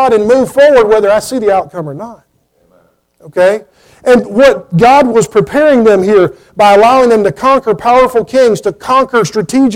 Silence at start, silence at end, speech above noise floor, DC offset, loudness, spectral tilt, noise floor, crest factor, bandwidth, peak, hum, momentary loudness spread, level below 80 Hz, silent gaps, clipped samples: 0 s; 0 s; 45 dB; under 0.1%; -8 LUFS; -5.5 dB/octave; -54 dBFS; 8 dB; 16.5 kHz; 0 dBFS; none; 9 LU; -42 dBFS; none; under 0.1%